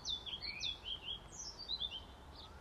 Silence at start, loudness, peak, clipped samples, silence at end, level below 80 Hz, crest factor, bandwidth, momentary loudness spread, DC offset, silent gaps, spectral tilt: 0 s; -42 LUFS; -30 dBFS; under 0.1%; 0 s; -60 dBFS; 16 dB; 14.5 kHz; 13 LU; under 0.1%; none; -1 dB/octave